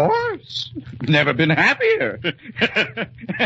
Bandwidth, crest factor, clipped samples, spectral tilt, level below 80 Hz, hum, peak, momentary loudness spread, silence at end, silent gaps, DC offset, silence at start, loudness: 8 kHz; 18 dB; under 0.1%; -6 dB/octave; -54 dBFS; none; -2 dBFS; 13 LU; 0 s; none; under 0.1%; 0 s; -19 LUFS